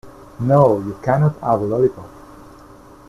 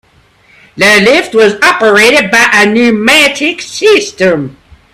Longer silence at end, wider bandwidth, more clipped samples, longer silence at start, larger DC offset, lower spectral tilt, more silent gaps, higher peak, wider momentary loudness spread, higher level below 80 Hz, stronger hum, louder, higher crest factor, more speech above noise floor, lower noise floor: first, 0.9 s vs 0.45 s; second, 12 kHz vs 16.5 kHz; second, under 0.1% vs 0.6%; second, 0.05 s vs 0.75 s; neither; first, -10 dB/octave vs -3 dB/octave; neither; about the same, -2 dBFS vs 0 dBFS; about the same, 8 LU vs 7 LU; about the same, -48 dBFS vs -46 dBFS; neither; second, -17 LUFS vs -6 LUFS; first, 18 dB vs 8 dB; second, 26 dB vs 39 dB; about the same, -43 dBFS vs -46 dBFS